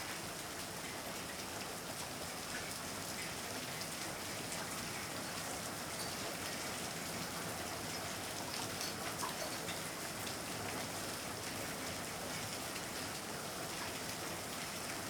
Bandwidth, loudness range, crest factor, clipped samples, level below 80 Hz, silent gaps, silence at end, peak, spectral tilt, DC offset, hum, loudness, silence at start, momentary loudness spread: over 20 kHz; 1 LU; 22 dB; under 0.1%; -66 dBFS; none; 0 s; -22 dBFS; -2.5 dB/octave; under 0.1%; none; -41 LUFS; 0 s; 3 LU